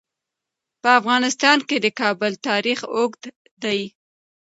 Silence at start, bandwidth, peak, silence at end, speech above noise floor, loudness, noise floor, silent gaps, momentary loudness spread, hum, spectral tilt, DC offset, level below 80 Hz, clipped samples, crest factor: 0.85 s; 8 kHz; 0 dBFS; 0.55 s; 64 dB; -20 LUFS; -84 dBFS; 3.36-3.45 s, 3.51-3.57 s; 10 LU; none; -2.5 dB/octave; under 0.1%; -76 dBFS; under 0.1%; 22 dB